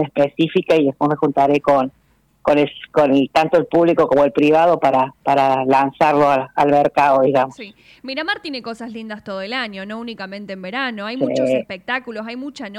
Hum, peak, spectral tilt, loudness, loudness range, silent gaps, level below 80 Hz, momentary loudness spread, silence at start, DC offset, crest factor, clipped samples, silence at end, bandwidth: none; -6 dBFS; -6.5 dB/octave; -17 LUFS; 10 LU; none; -56 dBFS; 15 LU; 0 s; under 0.1%; 12 dB; under 0.1%; 0 s; 12 kHz